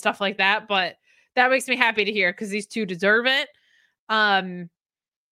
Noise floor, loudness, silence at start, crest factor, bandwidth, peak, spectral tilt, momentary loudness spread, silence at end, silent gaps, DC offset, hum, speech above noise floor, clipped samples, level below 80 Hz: under -90 dBFS; -21 LUFS; 0 s; 22 dB; 16 kHz; -2 dBFS; -3.5 dB/octave; 10 LU; 0.65 s; 3.99-4.07 s; under 0.1%; none; over 68 dB; under 0.1%; -76 dBFS